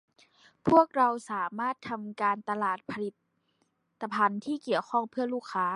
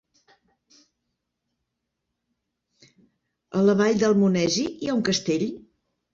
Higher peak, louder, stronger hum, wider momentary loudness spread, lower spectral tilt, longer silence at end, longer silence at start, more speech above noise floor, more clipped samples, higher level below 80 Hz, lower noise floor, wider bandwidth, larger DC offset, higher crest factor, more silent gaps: about the same, -8 dBFS vs -8 dBFS; second, -29 LUFS vs -22 LUFS; neither; first, 13 LU vs 10 LU; about the same, -6 dB/octave vs -5 dB/octave; second, 0 s vs 0.55 s; second, 0.65 s vs 3.55 s; second, 46 dB vs 59 dB; neither; second, -70 dBFS vs -62 dBFS; second, -75 dBFS vs -81 dBFS; first, 11 kHz vs 7.8 kHz; neither; about the same, 22 dB vs 18 dB; neither